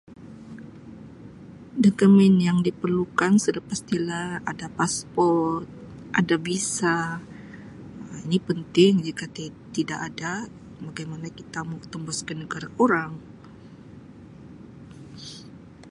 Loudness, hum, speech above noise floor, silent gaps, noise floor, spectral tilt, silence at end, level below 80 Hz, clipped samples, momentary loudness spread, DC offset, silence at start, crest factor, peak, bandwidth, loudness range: -24 LUFS; none; 22 dB; none; -45 dBFS; -5.5 dB/octave; 0 s; -58 dBFS; under 0.1%; 25 LU; under 0.1%; 0.1 s; 20 dB; -4 dBFS; 11.5 kHz; 9 LU